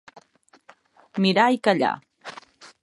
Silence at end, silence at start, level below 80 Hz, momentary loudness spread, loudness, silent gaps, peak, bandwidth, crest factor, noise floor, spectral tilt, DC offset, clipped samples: 0.15 s; 0.15 s; -76 dBFS; 22 LU; -21 LUFS; none; -4 dBFS; 11.5 kHz; 22 dB; -59 dBFS; -6 dB/octave; under 0.1%; under 0.1%